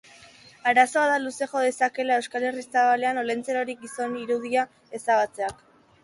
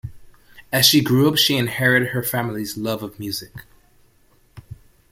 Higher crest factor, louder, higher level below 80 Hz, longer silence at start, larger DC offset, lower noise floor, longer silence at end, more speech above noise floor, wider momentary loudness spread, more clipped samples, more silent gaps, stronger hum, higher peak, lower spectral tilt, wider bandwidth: about the same, 20 dB vs 20 dB; second, -25 LUFS vs -18 LUFS; second, -68 dBFS vs -52 dBFS; first, 0.65 s vs 0.05 s; neither; second, -51 dBFS vs -57 dBFS; about the same, 0.5 s vs 0.4 s; second, 27 dB vs 37 dB; second, 11 LU vs 14 LU; neither; neither; neither; second, -6 dBFS vs -2 dBFS; about the same, -3 dB/octave vs -4 dB/octave; second, 11.5 kHz vs 17 kHz